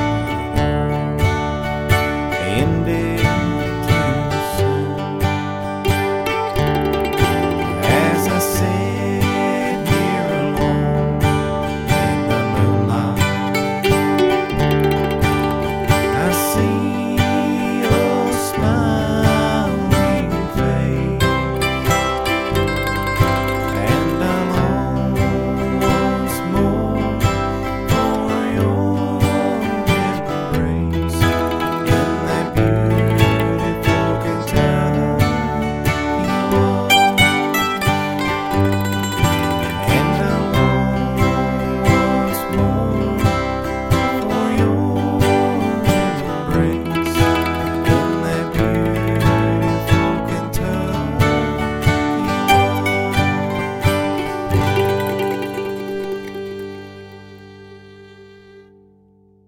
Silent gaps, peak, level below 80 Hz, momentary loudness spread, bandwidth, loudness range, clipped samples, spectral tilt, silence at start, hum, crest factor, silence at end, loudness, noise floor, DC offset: none; 0 dBFS; -32 dBFS; 5 LU; 17 kHz; 2 LU; under 0.1%; -6 dB/octave; 0 s; none; 18 dB; 0.85 s; -18 LUFS; -52 dBFS; under 0.1%